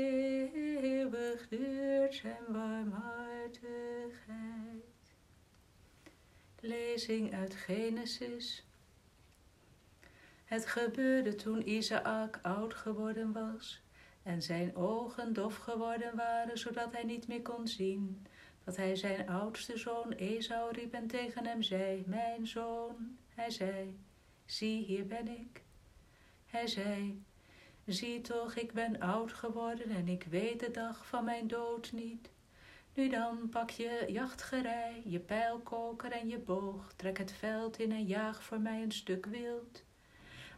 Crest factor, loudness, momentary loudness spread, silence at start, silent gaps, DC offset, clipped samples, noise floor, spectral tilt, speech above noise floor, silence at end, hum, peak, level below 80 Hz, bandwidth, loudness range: 18 dB; -39 LUFS; 10 LU; 0 s; none; under 0.1%; under 0.1%; -66 dBFS; -5 dB/octave; 27 dB; 0 s; none; -20 dBFS; -68 dBFS; 14 kHz; 5 LU